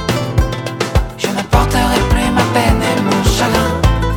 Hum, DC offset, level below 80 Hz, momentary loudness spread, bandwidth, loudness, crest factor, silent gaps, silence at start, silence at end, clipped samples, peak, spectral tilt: none; under 0.1%; -20 dBFS; 5 LU; 18.5 kHz; -14 LUFS; 14 dB; none; 0 s; 0 s; under 0.1%; 0 dBFS; -5 dB/octave